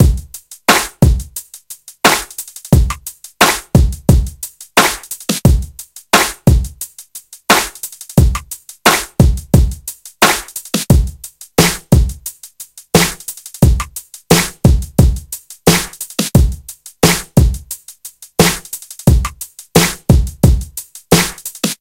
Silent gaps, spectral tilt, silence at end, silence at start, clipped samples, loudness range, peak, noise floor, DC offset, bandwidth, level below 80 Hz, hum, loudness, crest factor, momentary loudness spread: none; -4.5 dB/octave; 0.05 s; 0 s; 0.3%; 2 LU; 0 dBFS; -36 dBFS; under 0.1%; 17.5 kHz; -20 dBFS; none; -14 LUFS; 14 dB; 16 LU